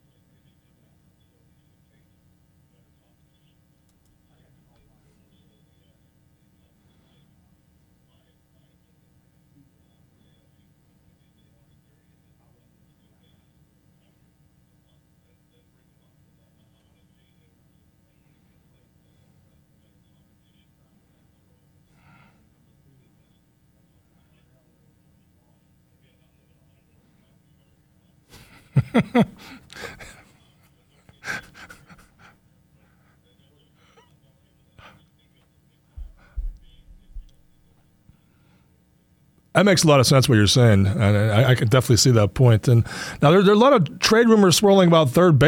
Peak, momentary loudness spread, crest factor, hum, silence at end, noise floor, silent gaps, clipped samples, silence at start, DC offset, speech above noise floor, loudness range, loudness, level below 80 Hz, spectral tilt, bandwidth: -4 dBFS; 26 LU; 22 dB; none; 0 s; -61 dBFS; none; under 0.1%; 28.75 s; under 0.1%; 45 dB; 29 LU; -17 LUFS; -48 dBFS; -5.5 dB/octave; 17 kHz